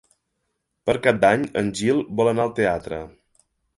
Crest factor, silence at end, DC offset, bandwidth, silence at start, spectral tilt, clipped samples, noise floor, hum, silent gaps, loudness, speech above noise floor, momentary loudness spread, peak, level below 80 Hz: 20 dB; 0.7 s; under 0.1%; 11.5 kHz; 0.85 s; -5.5 dB/octave; under 0.1%; -76 dBFS; none; none; -21 LUFS; 55 dB; 13 LU; -2 dBFS; -52 dBFS